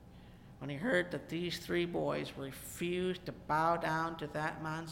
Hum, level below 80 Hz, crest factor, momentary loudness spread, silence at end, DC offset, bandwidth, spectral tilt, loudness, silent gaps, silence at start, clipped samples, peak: none; -60 dBFS; 20 dB; 12 LU; 0 s; under 0.1%; 17 kHz; -5.5 dB/octave; -36 LUFS; none; 0 s; under 0.1%; -18 dBFS